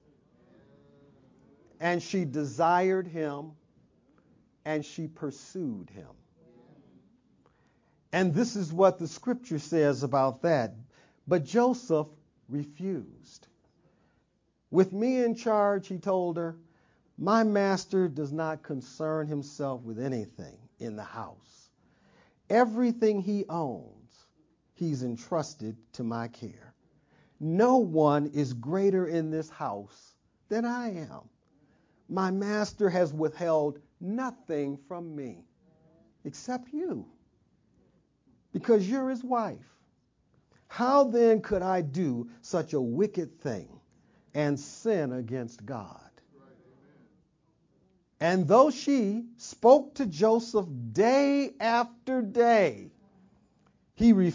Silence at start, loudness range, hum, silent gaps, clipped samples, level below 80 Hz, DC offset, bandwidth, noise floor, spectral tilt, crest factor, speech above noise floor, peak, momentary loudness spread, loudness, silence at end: 1.8 s; 11 LU; none; none; under 0.1%; -66 dBFS; under 0.1%; 7.6 kHz; -73 dBFS; -6.5 dB/octave; 22 dB; 45 dB; -8 dBFS; 17 LU; -28 LUFS; 0 s